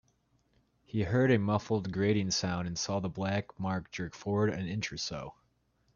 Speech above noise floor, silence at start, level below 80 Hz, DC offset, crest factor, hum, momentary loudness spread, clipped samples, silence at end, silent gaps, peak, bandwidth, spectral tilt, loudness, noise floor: 41 dB; 0.95 s; -60 dBFS; under 0.1%; 20 dB; none; 11 LU; under 0.1%; 0.65 s; none; -14 dBFS; 7.4 kHz; -5.5 dB/octave; -32 LUFS; -73 dBFS